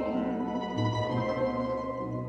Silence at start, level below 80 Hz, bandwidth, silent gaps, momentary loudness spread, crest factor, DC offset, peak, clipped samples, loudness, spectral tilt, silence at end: 0 s; -54 dBFS; 8.2 kHz; none; 3 LU; 12 dB; under 0.1%; -18 dBFS; under 0.1%; -31 LUFS; -7.5 dB/octave; 0 s